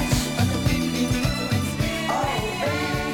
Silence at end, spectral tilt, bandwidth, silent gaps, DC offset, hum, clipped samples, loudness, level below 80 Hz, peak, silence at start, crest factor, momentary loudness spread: 0 s; -5 dB/octave; 19 kHz; none; under 0.1%; none; under 0.1%; -24 LUFS; -36 dBFS; -8 dBFS; 0 s; 14 dB; 3 LU